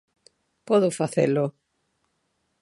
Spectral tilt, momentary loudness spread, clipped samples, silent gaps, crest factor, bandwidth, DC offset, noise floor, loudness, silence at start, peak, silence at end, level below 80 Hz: -6.5 dB/octave; 5 LU; under 0.1%; none; 18 dB; 11.5 kHz; under 0.1%; -74 dBFS; -23 LUFS; 0.7 s; -8 dBFS; 1.1 s; -74 dBFS